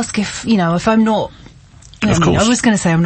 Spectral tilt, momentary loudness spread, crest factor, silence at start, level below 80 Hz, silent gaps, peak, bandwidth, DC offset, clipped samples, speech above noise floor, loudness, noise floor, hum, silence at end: -5 dB/octave; 7 LU; 12 dB; 0 s; -36 dBFS; none; -2 dBFS; 8.8 kHz; under 0.1%; under 0.1%; 27 dB; -14 LUFS; -41 dBFS; none; 0 s